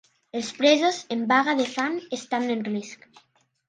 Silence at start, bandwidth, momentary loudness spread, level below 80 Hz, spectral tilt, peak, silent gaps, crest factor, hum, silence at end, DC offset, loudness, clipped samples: 0.35 s; 9.8 kHz; 13 LU; -76 dBFS; -3.5 dB/octave; -6 dBFS; none; 20 dB; none; 0.75 s; under 0.1%; -24 LUFS; under 0.1%